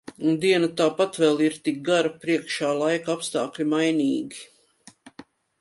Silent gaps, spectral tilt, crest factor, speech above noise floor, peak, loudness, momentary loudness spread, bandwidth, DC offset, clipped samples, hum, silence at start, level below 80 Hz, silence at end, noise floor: none; -4.5 dB/octave; 16 dB; 31 dB; -8 dBFS; -23 LUFS; 7 LU; 11.5 kHz; under 0.1%; under 0.1%; none; 0.1 s; -72 dBFS; 0.4 s; -54 dBFS